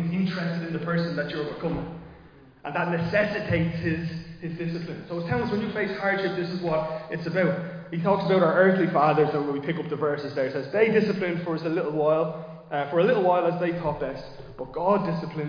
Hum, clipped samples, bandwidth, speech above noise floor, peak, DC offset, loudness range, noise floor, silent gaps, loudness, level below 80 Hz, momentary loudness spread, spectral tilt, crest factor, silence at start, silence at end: none; under 0.1%; 5.2 kHz; 25 dB; -8 dBFS; under 0.1%; 5 LU; -51 dBFS; none; -26 LUFS; -54 dBFS; 12 LU; -8.5 dB/octave; 18 dB; 0 s; 0 s